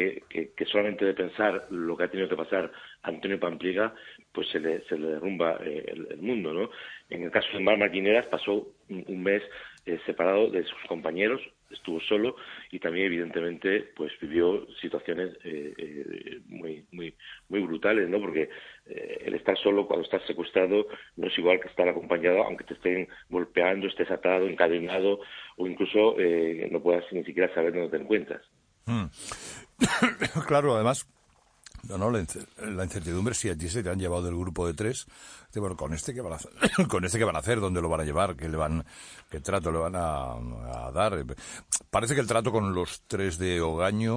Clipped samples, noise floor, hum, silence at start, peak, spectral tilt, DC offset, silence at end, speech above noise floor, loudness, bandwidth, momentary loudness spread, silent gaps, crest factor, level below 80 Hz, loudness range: under 0.1%; -58 dBFS; none; 0 s; -6 dBFS; -5 dB/octave; under 0.1%; 0 s; 30 dB; -28 LUFS; 10.5 kHz; 14 LU; none; 22 dB; -50 dBFS; 5 LU